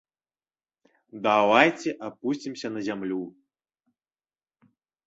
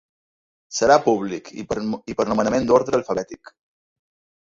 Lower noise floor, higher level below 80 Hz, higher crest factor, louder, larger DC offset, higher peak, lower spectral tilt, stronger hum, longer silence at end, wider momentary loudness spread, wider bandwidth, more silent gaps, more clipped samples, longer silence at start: about the same, under -90 dBFS vs under -90 dBFS; second, -72 dBFS vs -54 dBFS; first, 26 dB vs 20 dB; second, -25 LUFS vs -21 LUFS; neither; about the same, -2 dBFS vs -2 dBFS; about the same, -4.5 dB/octave vs -4.5 dB/octave; neither; first, 1.75 s vs 1.05 s; about the same, 14 LU vs 13 LU; about the same, 8 kHz vs 7.8 kHz; neither; neither; first, 1.15 s vs 0.7 s